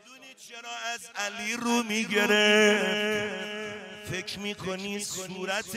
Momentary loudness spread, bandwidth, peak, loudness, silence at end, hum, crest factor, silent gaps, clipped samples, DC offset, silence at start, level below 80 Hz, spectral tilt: 17 LU; 16 kHz; -10 dBFS; -27 LUFS; 0 s; none; 18 dB; none; under 0.1%; under 0.1%; 0.05 s; -68 dBFS; -2.5 dB/octave